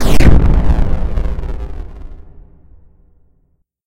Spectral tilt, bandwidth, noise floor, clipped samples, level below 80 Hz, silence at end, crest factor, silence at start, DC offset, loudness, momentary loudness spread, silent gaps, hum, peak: -7 dB/octave; 15 kHz; -58 dBFS; 2%; -16 dBFS; 1.65 s; 12 dB; 0 s; under 0.1%; -16 LUFS; 23 LU; none; none; 0 dBFS